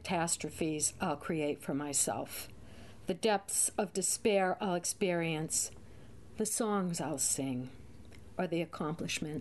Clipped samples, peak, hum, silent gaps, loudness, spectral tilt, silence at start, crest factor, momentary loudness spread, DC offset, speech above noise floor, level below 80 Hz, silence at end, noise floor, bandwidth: under 0.1%; -16 dBFS; none; none; -33 LUFS; -3.5 dB/octave; 0 s; 18 dB; 12 LU; 0.1%; 20 dB; -62 dBFS; 0 s; -54 dBFS; 12.5 kHz